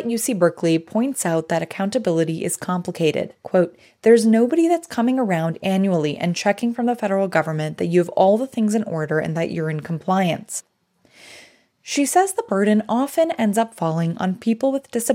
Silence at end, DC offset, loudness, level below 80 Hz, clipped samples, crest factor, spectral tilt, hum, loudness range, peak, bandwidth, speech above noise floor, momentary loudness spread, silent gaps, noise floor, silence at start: 0 s; under 0.1%; -20 LUFS; -70 dBFS; under 0.1%; 18 dB; -5.5 dB/octave; none; 4 LU; -2 dBFS; 16.5 kHz; 37 dB; 7 LU; none; -57 dBFS; 0 s